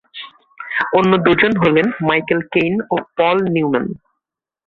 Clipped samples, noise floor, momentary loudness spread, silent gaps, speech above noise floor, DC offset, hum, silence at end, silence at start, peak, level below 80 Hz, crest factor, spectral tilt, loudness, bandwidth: under 0.1%; -80 dBFS; 20 LU; none; 65 dB; under 0.1%; none; 0.7 s; 0.15 s; 0 dBFS; -52 dBFS; 16 dB; -8 dB/octave; -16 LUFS; 6.8 kHz